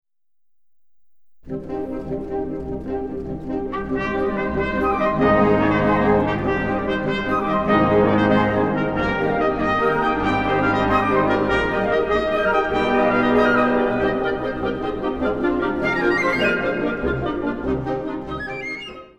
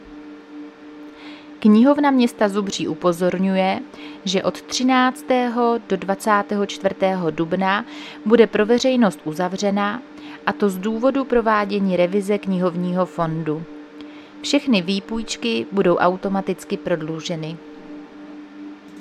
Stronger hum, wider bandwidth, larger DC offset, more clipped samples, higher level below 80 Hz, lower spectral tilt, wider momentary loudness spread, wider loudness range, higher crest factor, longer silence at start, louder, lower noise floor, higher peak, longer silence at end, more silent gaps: neither; second, 9 kHz vs 14 kHz; first, 0.6% vs under 0.1%; neither; first, -38 dBFS vs -54 dBFS; first, -7.5 dB/octave vs -5.5 dB/octave; second, 11 LU vs 22 LU; first, 7 LU vs 4 LU; about the same, 16 dB vs 20 dB; about the same, 0.05 s vs 0 s; about the same, -20 LUFS vs -20 LUFS; first, -65 dBFS vs -39 dBFS; second, -4 dBFS vs 0 dBFS; about the same, 0 s vs 0 s; neither